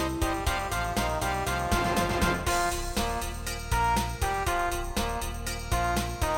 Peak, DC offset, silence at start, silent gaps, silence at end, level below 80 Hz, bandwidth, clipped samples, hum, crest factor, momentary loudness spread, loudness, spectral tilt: -14 dBFS; under 0.1%; 0 s; none; 0 s; -34 dBFS; 17.5 kHz; under 0.1%; none; 16 dB; 6 LU; -29 LUFS; -4 dB/octave